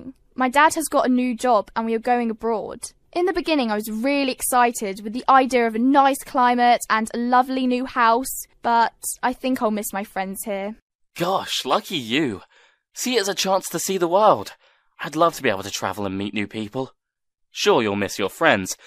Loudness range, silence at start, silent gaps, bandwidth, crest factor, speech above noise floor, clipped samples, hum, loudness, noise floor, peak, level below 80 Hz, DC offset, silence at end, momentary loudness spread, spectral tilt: 6 LU; 0 s; 10.82-10.88 s, 10.95-10.99 s; 15.5 kHz; 20 dB; 54 dB; under 0.1%; none; -21 LUFS; -75 dBFS; -2 dBFS; -56 dBFS; under 0.1%; 0.1 s; 11 LU; -3.5 dB/octave